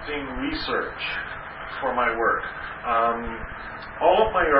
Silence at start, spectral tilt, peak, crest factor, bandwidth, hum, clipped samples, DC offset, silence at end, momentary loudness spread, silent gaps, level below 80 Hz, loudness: 0 s; -9 dB/octave; -4 dBFS; 20 dB; 5.6 kHz; none; under 0.1%; under 0.1%; 0 s; 14 LU; none; -44 dBFS; -25 LUFS